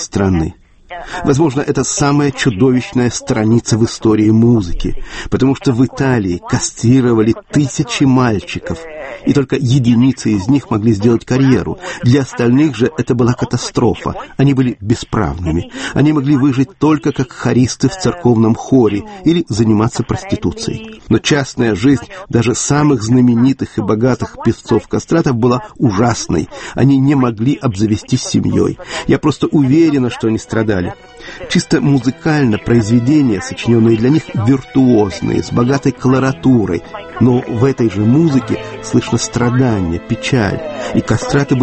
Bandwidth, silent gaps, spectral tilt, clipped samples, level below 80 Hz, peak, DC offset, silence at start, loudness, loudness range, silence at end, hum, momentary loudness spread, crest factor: 8.8 kHz; none; -6 dB/octave; under 0.1%; -34 dBFS; 0 dBFS; under 0.1%; 0 s; -14 LUFS; 2 LU; 0 s; none; 8 LU; 12 dB